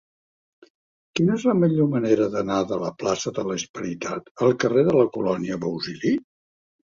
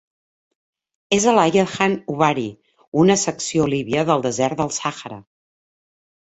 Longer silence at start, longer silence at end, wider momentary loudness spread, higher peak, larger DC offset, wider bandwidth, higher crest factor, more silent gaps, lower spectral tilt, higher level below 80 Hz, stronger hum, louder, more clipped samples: about the same, 1.15 s vs 1.1 s; second, 0.75 s vs 1 s; about the same, 9 LU vs 11 LU; about the same, -4 dBFS vs -2 dBFS; neither; about the same, 7.6 kHz vs 8.2 kHz; about the same, 18 dB vs 18 dB; about the same, 3.69-3.74 s, 4.31-4.35 s vs 2.87-2.92 s; first, -6 dB/octave vs -4.5 dB/octave; about the same, -60 dBFS vs -56 dBFS; neither; second, -23 LUFS vs -19 LUFS; neither